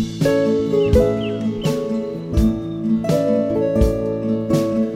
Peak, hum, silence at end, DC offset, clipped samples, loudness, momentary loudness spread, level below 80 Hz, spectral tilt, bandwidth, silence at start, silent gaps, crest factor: -2 dBFS; none; 0 s; under 0.1%; under 0.1%; -19 LUFS; 6 LU; -28 dBFS; -7.5 dB/octave; 16 kHz; 0 s; none; 16 dB